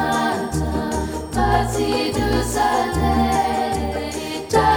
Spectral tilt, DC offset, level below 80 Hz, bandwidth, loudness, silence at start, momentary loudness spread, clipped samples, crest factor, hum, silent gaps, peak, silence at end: -5 dB/octave; under 0.1%; -30 dBFS; over 20 kHz; -20 LUFS; 0 s; 7 LU; under 0.1%; 16 dB; none; none; -4 dBFS; 0 s